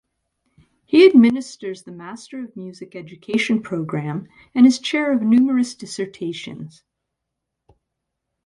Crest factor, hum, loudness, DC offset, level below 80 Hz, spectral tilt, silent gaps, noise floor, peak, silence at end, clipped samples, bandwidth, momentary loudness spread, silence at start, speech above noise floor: 20 dB; none; -18 LUFS; under 0.1%; -66 dBFS; -5.5 dB/octave; none; -80 dBFS; 0 dBFS; 1.8 s; under 0.1%; 11 kHz; 22 LU; 0.9 s; 62 dB